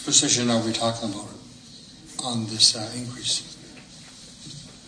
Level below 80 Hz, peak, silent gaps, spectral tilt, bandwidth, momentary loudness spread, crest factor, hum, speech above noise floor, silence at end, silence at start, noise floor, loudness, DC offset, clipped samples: -60 dBFS; -2 dBFS; none; -2 dB/octave; 10.5 kHz; 26 LU; 26 dB; none; 22 dB; 0 s; 0 s; -46 dBFS; -22 LUFS; under 0.1%; under 0.1%